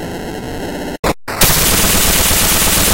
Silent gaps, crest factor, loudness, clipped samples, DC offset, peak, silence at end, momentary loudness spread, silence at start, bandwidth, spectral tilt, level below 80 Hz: 0.99-1.03 s; 14 dB; -11 LUFS; under 0.1%; under 0.1%; 0 dBFS; 0 s; 14 LU; 0 s; 17.5 kHz; -2 dB/octave; -24 dBFS